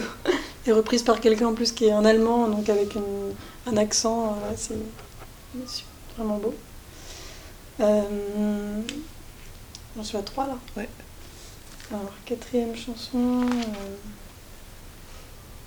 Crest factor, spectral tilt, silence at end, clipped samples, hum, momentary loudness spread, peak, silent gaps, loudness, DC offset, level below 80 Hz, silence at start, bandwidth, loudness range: 22 dB; -4 dB/octave; 0 s; under 0.1%; none; 24 LU; -6 dBFS; none; -25 LUFS; under 0.1%; -46 dBFS; 0 s; over 20 kHz; 12 LU